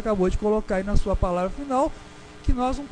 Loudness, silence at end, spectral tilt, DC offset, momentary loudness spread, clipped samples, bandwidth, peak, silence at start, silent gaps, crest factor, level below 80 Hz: -25 LUFS; 0 s; -7 dB/octave; under 0.1%; 8 LU; under 0.1%; 10 kHz; -6 dBFS; 0 s; none; 16 dB; -28 dBFS